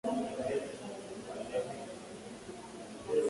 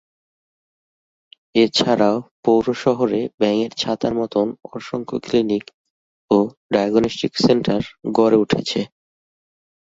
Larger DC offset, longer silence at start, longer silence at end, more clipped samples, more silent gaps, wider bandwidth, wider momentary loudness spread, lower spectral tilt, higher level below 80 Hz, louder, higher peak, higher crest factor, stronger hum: neither; second, 0.05 s vs 1.55 s; second, 0 s vs 1.15 s; neither; second, none vs 2.31-2.43 s, 3.34-3.38 s, 5.74-6.28 s, 6.57-6.69 s; first, 11.5 kHz vs 8 kHz; about the same, 11 LU vs 9 LU; about the same, -5 dB/octave vs -5.5 dB/octave; second, -68 dBFS vs -54 dBFS; second, -40 LUFS vs -19 LUFS; second, -20 dBFS vs -2 dBFS; about the same, 18 dB vs 18 dB; neither